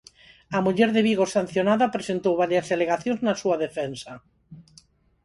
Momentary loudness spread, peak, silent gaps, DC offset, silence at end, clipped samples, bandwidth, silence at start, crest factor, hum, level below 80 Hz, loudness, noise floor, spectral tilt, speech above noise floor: 9 LU; -6 dBFS; none; under 0.1%; 0.65 s; under 0.1%; 11.5 kHz; 0.5 s; 18 dB; none; -62 dBFS; -23 LUFS; -57 dBFS; -5.5 dB/octave; 34 dB